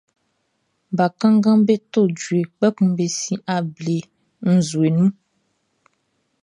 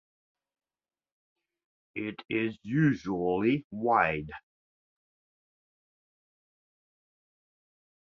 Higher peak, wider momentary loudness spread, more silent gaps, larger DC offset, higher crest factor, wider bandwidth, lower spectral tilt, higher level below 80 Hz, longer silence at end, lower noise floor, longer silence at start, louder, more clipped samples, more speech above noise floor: first, -4 dBFS vs -10 dBFS; second, 9 LU vs 14 LU; second, none vs 3.64-3.70 s; neither; second, 16 dB vs 24 dB; first, 10.5 kHz vs 7 kHz; second, -6.5 dB/octave vs -8 dB/octave; about the same, -66 dBFS vs -64 dBFS; second, 1.3 s vs 3.7 s; second, -70 dBFS vs under -90 dBFS; second, 0.9 s vs 1.95 s; first, -19 LUFS vs -29 LUFS; neither; second, 52 dB vs over 61 dB